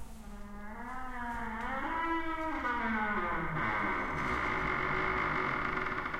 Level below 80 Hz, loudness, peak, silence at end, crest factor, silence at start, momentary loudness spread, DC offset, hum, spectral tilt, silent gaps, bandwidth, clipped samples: -48 dBFS; -34 LUFS; -20 dBFS; 0 s; 16 dB; 0 s; 12 LU; under 0.1%; none; -6 dB/octave; none; 15.5 kHz; under 0.1%